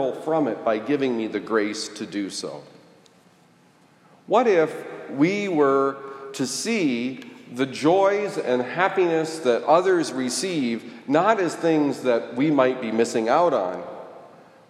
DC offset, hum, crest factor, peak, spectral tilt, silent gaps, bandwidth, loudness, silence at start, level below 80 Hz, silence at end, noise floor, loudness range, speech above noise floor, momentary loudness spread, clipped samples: under 0.1%; none; 18 dB; -4 dBFS; -4.5 dB/octave; none; 14.5 kHz; -22 LUFS; 0 s; -80 dBFS; 0.45 s; -56 dBFS; 5 LU; 34 dB; 13 LU; under 0.1%